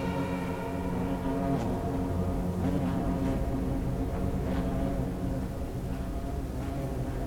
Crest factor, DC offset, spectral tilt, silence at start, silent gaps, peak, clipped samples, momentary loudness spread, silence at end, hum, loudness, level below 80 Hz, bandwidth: 14 dB; under 0.1%; -8 dB/octave; 0 s; none; -18 dBFS; under 0.1%; 5 LU; 0 s; none; -32 LUFS; -36 dBFS; 18.5 kHz